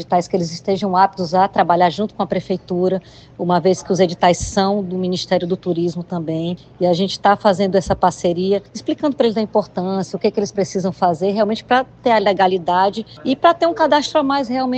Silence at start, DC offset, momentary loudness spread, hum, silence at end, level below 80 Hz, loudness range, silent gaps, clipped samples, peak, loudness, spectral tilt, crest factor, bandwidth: 0 s; under 0.1%; 7 LU; none; 0 s; -46 dBFS; 3 LU; none; under 0.1%; 0 dBFS; -18 LUFS; -5.5 dB/octave; 16 dB; 8.8 kHz